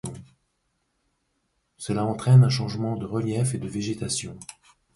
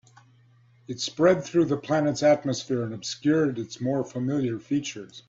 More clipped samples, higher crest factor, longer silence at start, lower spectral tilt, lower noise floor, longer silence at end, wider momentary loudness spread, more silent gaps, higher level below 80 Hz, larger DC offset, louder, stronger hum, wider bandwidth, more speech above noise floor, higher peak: neither; about the same, 20 dB vs 18 dB; second, 0.05 s vs 0.9 s; about the same, -6 dB/octave vs -5.5 dB/octave; first, -74 dBFS vs -58 dBFS; first, 0.5 s vs 0.1 s; first, 21 LU vs 10 LU; neither; first, -56 dBFS vs -64 dBFS; neither; about the same, -24 LUFS vs -25 LUFS; neither; first, 11.5 kHz vs 7.8 kHz; first, 51 dB vs 33 dB; about the same, -6 dBFS vs -8 dBFS